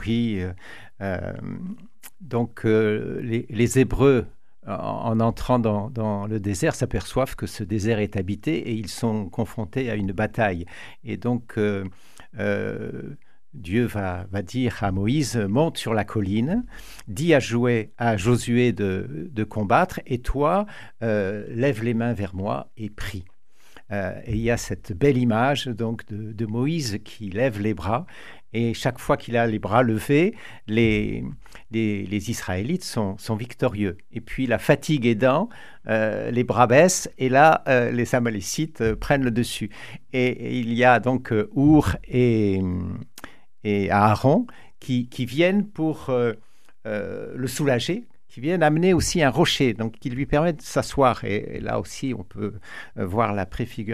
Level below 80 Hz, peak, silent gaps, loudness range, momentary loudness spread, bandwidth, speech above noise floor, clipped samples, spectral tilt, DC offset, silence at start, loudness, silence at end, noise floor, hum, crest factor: -42 dBFS; -2 dBFS; none; 6 LU; 14 LU; 14.5 kHz; 31 dB; under 0.1%; -6 dB/octave; 0.9%; 0 s; -23 LUFS; 0 s; -54 dBFS; none; 22 dB